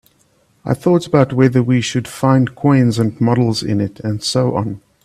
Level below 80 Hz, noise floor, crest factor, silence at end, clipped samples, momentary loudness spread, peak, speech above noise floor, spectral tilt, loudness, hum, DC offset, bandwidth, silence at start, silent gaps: -50 dBFS; -57 dBFS; 16 dB; 0.25 s; under 0.1%; 8 LU; 0 dBFS; 42 dB; -6.5 dB/octave; -16 LUFS; none; under 0.1%; 13.5 kHz; 0.65 s; none